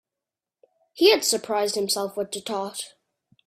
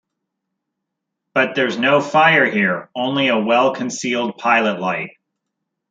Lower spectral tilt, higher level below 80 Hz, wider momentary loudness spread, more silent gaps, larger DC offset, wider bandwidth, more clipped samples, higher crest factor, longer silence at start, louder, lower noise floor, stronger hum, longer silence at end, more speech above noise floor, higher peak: second, -2 dB/octave vs -4.5 dB/octave; about the same, -70 dBFS vs -70 dBFS; first, 14 LU vs 10 LU; neither; neither; first, 16 kHz vs 9.2 kHz; neither; about the same, 22 dB vs 18 dB; second, 0.95 s vs 1.35 s; second, -23 LUFS vs -17 LUFS; first, -88 dBFS vs -79 dBFS; neither; second, 0.6 s vs 0.8 s; about the same, 65 dB vs 62 dB; second, -4 dBFS vs 0 dBFS